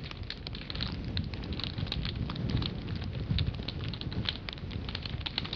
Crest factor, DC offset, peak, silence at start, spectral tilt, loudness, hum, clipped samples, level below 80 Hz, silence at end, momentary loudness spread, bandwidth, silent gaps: 22 dB; under 0.1%; -14 dBFS; 0 s; -7 dB/octave; -36 LUFS; none; under 0.1%; -42 dBFS; 0 s; 6 LU; 6.8 kHz; none